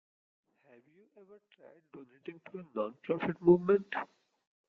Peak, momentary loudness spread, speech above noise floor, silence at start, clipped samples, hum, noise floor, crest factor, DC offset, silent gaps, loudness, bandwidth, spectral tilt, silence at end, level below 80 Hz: -12 dBFS; 22 LU; 31 dB; 1.95 s; under 0.1%; none; -64 dBFS; 22 dB; under 0.1%; none; -31 LUFS; 4.2 kHz; -9.5 dB/octave; 0.65 s; -70 dBFS